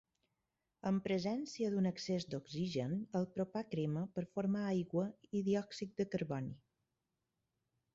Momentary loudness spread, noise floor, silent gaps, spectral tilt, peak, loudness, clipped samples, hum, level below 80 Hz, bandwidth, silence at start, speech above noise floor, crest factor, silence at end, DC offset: 6 LU; -88 dBFS; none; -7 dB/octave; -24 dBFS; -39 LUFS; under 0.1%; none; -74 dBFS; 7.6 kHz; 0.85 s; 50 dB; 16 dB; 1.35 s; under 0.1%